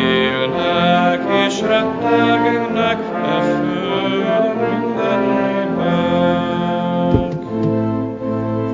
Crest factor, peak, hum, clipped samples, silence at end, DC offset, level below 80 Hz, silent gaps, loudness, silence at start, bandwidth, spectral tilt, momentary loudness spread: 16 dB; 0 dBFS; none; under 0.1%; 0 s; under 0.1%; -42 dBFS; none; -17 LUFS; 0 s; 7.8 kHz; -6.5 dB/octave; 5 LU